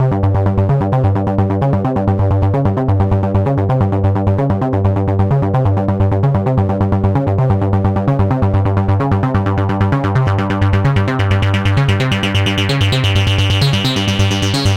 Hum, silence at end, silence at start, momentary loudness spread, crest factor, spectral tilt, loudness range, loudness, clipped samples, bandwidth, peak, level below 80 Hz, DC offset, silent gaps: none; 0 s; 0 s; 2 LU; 12 dB; -6.5 dB/octave; 1 LU; -14 LUFS; under 0.1%; 9.8 kHz; 0 dBFS; -30 dBFS; under 0.1%; none